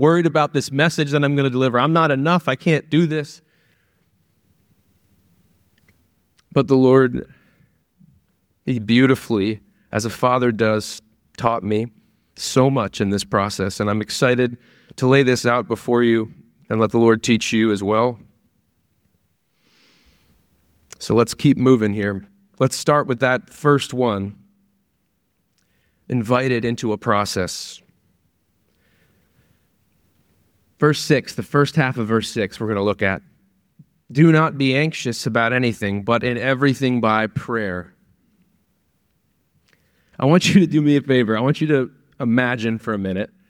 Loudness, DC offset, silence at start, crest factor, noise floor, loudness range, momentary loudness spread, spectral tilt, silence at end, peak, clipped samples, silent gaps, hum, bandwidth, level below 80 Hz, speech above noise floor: -19 LUFS; under 0.1%; 0 s; 18 dB; -69 dBFS; 7 LU; 10 LU; -6 dB/octave; 0.25 s; -2 dBFS; under 0.1%; none; none; 16.5 kHz; -56 dBFS; 51 dB